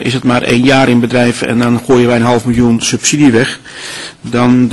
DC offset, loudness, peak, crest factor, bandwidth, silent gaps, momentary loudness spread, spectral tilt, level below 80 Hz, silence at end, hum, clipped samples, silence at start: 0.8%; -10 LUFS; 0 dBFS; 10 dB; 12 kHz; none; 13 LU; -5 dB/octave; -38 dBFS; 0 s; none; under 0.1%; 0 s